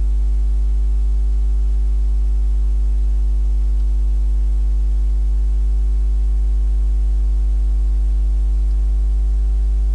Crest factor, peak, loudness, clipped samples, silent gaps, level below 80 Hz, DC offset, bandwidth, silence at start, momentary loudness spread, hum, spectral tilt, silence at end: 4 dB; -12 dBFS; -20 LUFS; under 0.1%; none; -16 dBFS; under 0.1%; 1.3 kHz; 0 s; 0 LU; 50 Hz at -15 dBFS; -8 dB/octave; 0 s